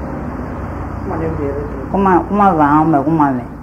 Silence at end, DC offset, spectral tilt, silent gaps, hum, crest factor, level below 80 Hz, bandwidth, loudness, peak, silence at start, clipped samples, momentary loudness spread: 0 s; under 0.1%; -9.5 dB/octave; none; none; 14 dB; -32 dBFS; 7.6 kHz; -15 LUFS; 0 dBFS; 0 s; under 0.1%; 13 LU